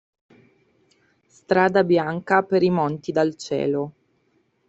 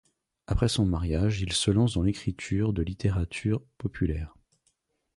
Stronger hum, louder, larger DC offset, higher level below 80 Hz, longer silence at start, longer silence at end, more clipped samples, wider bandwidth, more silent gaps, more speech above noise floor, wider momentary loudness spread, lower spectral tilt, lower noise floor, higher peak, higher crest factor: neither; first, -21 LUFS vs -28 LUFS; neither; second, -64 dBFS vs -38 dBFS; first, 1.5 s vs 0.5 s; about the same, 0.8 s vs 0.9 s; neither; second, 8 kHz vs 11.5 kHz; neither; about the same, 45 dB vs 47 dB; about the same, 7 LU vs 8 LU; about the same, -6.5 dB/octave vs -5.5 dB/octave; second, -66 dBFS vs -73 dBFS; first, -2 dBFS vs -10 dBFS; about the same, 20 dB vs 18 dB